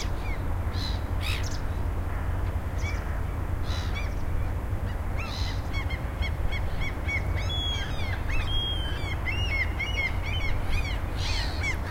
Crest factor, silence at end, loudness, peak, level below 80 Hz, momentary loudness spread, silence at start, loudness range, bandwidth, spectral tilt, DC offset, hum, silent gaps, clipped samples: 14 dB; 0 s; -30 LUFS; -14 dBFS; -30 dBFS; 4 LU; 0 s; 3 LU; 16 kHz; -5 dB/octave; under 0.1%; none; none; under 0.1%